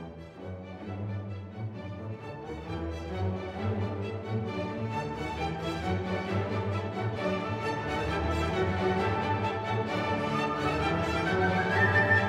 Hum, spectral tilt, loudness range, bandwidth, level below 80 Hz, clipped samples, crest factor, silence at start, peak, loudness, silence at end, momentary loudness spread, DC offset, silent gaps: none; -6.5 dB/octave; 7 LU; 11 kHz; -48 dBFS; under 0.1%; 18 dB; 0 s; -12 dBFS; -31 LUFS; 0 s; 13 LU; under 0.1%; none